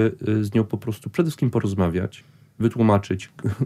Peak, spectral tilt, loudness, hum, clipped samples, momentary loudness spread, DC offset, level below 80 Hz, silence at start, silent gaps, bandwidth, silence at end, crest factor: -6 dBFS; -8 dB/octave; -23 LUFS; none; under 0.1%; 10 LU; under 0.1%; -50 dBFS; 0 s; none; 14.5 kHz; 0 s; 16 dB